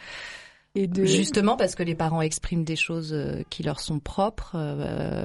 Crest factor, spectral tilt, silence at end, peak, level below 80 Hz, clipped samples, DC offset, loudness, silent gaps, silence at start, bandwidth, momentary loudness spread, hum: 18 dB; -5 dB/octave; 0 s; -8 dBFS; -44 dBFS; under 0.1%; under 0.1%; -26 LUFS; none; 0 s; 11.5 kHz; 11 LU; none